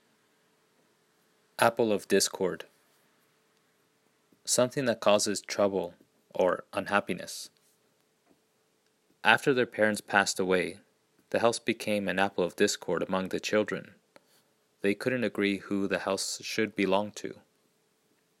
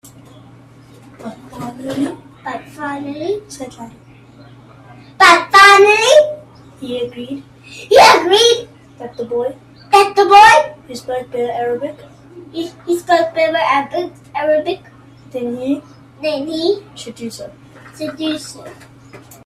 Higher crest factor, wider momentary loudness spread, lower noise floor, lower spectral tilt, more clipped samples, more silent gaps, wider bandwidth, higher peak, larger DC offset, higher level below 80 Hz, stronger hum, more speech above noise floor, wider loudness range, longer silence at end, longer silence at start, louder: first, 28 dB vs 16 dB; second, 13 LU vs 24 LU; first, -71 dBFS vs -42 dBFS; about the same, -3.5 dB/octave vs -2.5 dB/octave; neither; neither; about the same, 16 kHz vs 15.5 kHz; second, -4 dBFS vs 0 dBFS; neither; second, -76 dBFS vs -54 dBFS; neither; first, 43 dB vs 26 dB; second, 4 LU vs 15 LU; first, 1.05 s vs 0.3 s; first, 1.6 s vs 1.2 s; second, -29 LUFS vs -13 LUFS